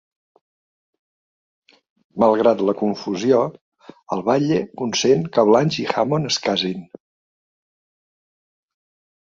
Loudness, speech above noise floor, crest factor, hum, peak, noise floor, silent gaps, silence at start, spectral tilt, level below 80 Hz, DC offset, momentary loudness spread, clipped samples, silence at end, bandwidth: -19 LUFS; over 71 dB; 20 dB; none; -2 dBFS; under -90 dBFS; 3.61-3.72 s; 2.15 s; -5 dB/octave; -62 dBFS; under 0.1%; 10 LU; under 0.1%; 2.4 s; 7.6 kHz